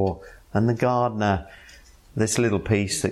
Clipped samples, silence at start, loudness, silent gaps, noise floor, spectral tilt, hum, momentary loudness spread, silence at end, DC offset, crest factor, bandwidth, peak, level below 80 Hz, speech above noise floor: under 0.1%; 0 s; -23 LUFS; none; -49 dBFS; -5.5 dB/octave; none; 12 LU; 0 s; under 0.1%; 16 dB; 14.5 kHz; -8 dBFS; -48 dBFS; 27 dB